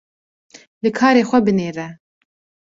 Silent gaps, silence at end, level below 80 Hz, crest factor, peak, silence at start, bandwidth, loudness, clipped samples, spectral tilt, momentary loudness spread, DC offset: none; 0.8 s; -58 dBFS; 18 dB; -2 dBFS; 0.85 s; 7.8 kHz; -17 LUFS; under 0.1%; -6 dB/octave; 15 LU; under 0.1%